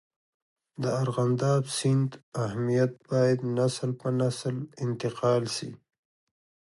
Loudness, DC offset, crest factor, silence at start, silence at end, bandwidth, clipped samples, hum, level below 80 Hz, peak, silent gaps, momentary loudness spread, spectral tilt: -28 LUFS; under 0.1%; 16 dB; 0.8 s; 1 s; 11.5 kHz; under 0.1%; none; -68 dBFS; -12 dBFS; 2.23-2.32 s; 8 LU; -6.5 dB/octave